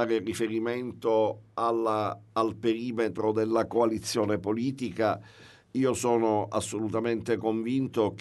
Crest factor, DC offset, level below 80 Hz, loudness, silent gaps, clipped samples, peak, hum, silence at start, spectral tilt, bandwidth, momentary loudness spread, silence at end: 16 dB; under 0.1%; -64 dBFS; -28 LUFS; none; under 0.1%; -12 dBFS; none; 0 s; -5.5 dB/octave; 12 kHz; 5 LU; 0 s